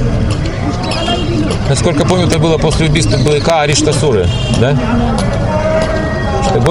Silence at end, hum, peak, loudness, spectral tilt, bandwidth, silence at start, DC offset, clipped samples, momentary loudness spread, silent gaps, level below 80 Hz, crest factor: 0 s; none; 0 dBFS; -12 LUFS; -5.5 dB/octave; 11.5 kHz; 0 s; under 0.1%; under 0.1%; 5 LU; none; -22 dBFS; 12 dB